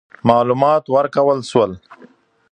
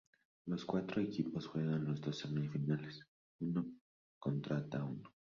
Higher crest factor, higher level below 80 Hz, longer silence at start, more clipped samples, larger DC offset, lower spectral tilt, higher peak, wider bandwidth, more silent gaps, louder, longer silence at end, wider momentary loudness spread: about the same, 16 dB vs 18 dB; first, -54 dBFS vs -74 dBFS; second, 0.25 s vs 0.45 s; neither; neither; about the same, -7 dB/octave vs -7 dB/octave; first, 0 dBFS vs -24 dBFS; first, 9.8 kHz vs 7.4 kHz; second, none vs 3.08-3.39 s, 3.81-4.21 s; first, -16 LUFS vs -41 LUFS; first, 0.6 s vs 0.2 s; second, 5 LU vs 9 LU